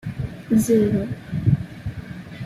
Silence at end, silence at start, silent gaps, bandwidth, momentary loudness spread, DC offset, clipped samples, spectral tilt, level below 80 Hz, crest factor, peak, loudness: 0 s; 0.05 s; none; 14.5 kHz; 15 LU; under 0.1%; under 0.1%; -7.5 dB/octave; -42 dBFS; 16 dB; -6 dBFS; -22 LUFS